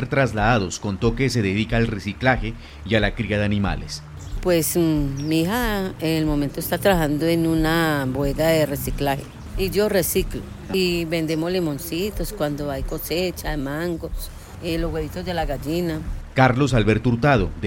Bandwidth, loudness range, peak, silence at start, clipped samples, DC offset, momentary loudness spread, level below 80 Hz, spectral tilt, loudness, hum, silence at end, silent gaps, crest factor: 17 kHz; 5 LU; -4 dBFS; 0 s; under 0.1%; under 0.1%; 9 LU; -34 dBFS; -5.5 dB/octave; -22 LUFS; none; 0 s; none; 18 dB